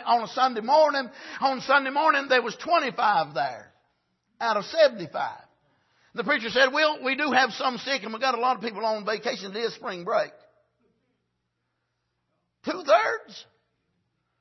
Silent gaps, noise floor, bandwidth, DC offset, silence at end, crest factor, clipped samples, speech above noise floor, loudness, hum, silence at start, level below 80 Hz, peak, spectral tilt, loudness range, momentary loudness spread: none; -78 dBFS; 6.2 kHz; under 0.1%; 1 s; 20 dB; under 0.1%; 53 dB; -24 LUFS; none; 0 s; -76 dBFS; -6 dBFS; -3.5 dB/octave; 8 LU; 13 LU